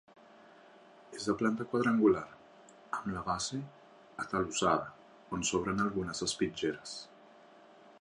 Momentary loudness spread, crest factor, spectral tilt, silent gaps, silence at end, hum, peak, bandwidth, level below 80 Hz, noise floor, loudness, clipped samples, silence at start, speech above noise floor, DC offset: 17 LU; 20 dB; -4 dB/octave; none; 0.1 s; none; -14 dBFS; 11.5 kHz; -62 dBFS; -58 dBFS; -33 LUFS; under 0.1%; 1.1 s; 25 dB; under 0.1%